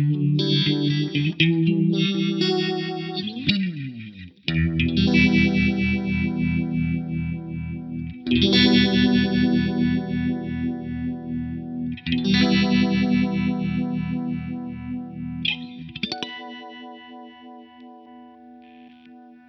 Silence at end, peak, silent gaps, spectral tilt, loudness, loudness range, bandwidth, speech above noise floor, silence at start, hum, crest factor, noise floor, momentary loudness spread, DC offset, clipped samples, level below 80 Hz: 0.15 s; -4 dBFS; none; -7 dB/octave; -22 LUFS; 11 LU; 7 kHz; 27 dB; 0 s; none; 18 dB; -47 dBFS; 15 LU; under 0.1%; under 0.1%; -42 dBFS